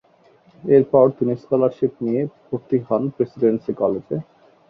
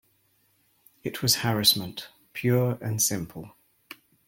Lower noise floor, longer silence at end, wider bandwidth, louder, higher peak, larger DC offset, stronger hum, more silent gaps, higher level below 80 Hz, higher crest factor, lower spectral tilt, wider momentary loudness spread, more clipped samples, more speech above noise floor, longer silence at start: second, -54 dBFS vs -67 dBFS; second, 0.45 s vs 0.8 s; second, 5.2 kHz vs 17 kHz; first, -20 LUFS vs -24 LUFS; about the same, -2 dBFS vs -4 dBFS; neither; neither; neither; about the same, -62 dBFS vs -62 dBFS; second, 18 dB vs 24 dB; first, -11 dB/octave vs -3.5 dB/octave; second, 12 LU vs 19 LU; neither; second, 35 dB vs 41 dB; second, 0.65 s vs 1.05 s